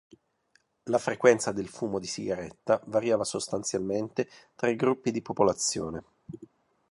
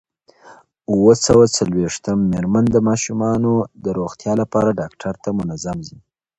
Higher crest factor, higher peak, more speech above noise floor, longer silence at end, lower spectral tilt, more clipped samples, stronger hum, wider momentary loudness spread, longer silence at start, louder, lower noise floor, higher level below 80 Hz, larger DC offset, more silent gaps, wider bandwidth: first, 24 dB vs 18 dB; second, -6 dBFS vs 0 dBFS; first, 41 dB vs 30 dB; about the same, 0.45 s vs 0.5 s; second, -4 dB/octave vs -5.5 dB/octave; neither; neither; about the same, 15 LU vs 14 LU; first, 0.85 s vs 0.45 s; second, -29 LUFS vs -18 LUFS; first, -69 dBFS vs -47 dBFS; second, -62 dBFS vs -44 dBFS; neither; neither; first, 11.5 kHz vs 8.8 kHz